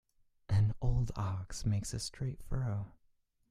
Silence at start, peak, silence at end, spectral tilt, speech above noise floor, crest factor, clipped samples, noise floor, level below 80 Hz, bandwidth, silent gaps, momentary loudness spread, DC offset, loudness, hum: 0.5 s; -18 dBFS; 0.6 s; -6 dB/octave; 36 dB; 16 dB; under 0.1%; -72 dBFS; -44 dBFS; 12.5 kHz; none; 9 LU; under 0.1%; -36 LUFS; none